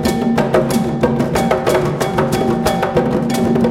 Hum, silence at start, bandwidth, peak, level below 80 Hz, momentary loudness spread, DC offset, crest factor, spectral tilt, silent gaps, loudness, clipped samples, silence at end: none; 0 s; 17 kHz; 0 dBFS; -36 dBFS; 2 LU; under 0.1%; 14 dB; -6 dB/octave; none; -16 LUFS; under 0.1%; 0 s